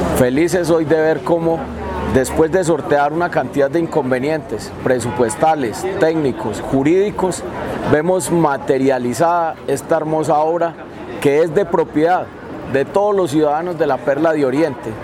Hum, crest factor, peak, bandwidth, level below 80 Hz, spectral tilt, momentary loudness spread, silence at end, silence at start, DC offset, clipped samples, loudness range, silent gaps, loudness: none; 16 dB; 0 dBFS; 16.5 kHz; -40 dBFS; -6 dB/octave; 7 LU; 0 s; 0 s; under 0.1%; under 0.1%; 1 LU; none; -17 LUFS